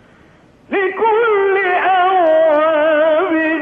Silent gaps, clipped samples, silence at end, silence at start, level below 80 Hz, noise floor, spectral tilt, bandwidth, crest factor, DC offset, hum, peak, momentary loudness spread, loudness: none; under 0.1%; 0 s; 0.7 s; -60 dBFS; -47 dBFS; -6 dB/octave; 4.1 kHz; 12 dB; under 0.1%; none; -2 dBFS; 4 LU; -13 LUFS